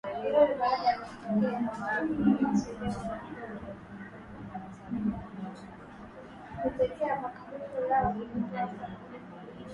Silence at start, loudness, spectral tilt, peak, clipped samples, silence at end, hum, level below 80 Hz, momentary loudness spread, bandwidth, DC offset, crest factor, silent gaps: 0.05 s; -31 LUFS; -7 dB/octave; -12 dBFS; under 0.1%; 0 s; none; -56 dBFS; 19 LU; 10.5 kHz; under 0.1%; 20 dB; none